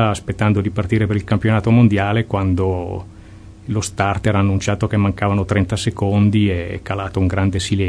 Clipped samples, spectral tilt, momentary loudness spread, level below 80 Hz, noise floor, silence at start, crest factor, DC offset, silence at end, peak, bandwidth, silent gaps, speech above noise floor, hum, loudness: under 0.1%; -6.5 dB/octave; 9 LU; -38 dBFS; -39 dBFS; 0 s; 16 dB; under 0.1%; 0 s; 0 dBFS; 11 kHz; none; 22 dB; none; -18 LUFS